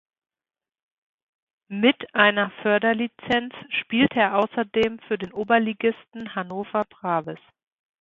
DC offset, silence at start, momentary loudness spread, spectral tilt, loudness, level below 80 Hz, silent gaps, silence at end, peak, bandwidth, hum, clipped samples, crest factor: under 0.1%; 1.7 s; 12 LU; -6.5 dB/octave; -23 LUFS; -60 dBFS; none; 0.65 s; -2 dBFS; 7.4 kHz; none; under 0.1%; 22 dB